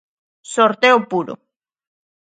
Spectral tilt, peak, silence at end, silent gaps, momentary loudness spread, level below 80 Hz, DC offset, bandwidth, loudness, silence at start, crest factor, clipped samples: -3.5 dB/octave; 0 dBFS; 1 s; none; 17 LU; -72 dBFS; under 0.1%; 9.2 kHz; -16 LUFS; 0.5 s; 20 dB; under 0.1%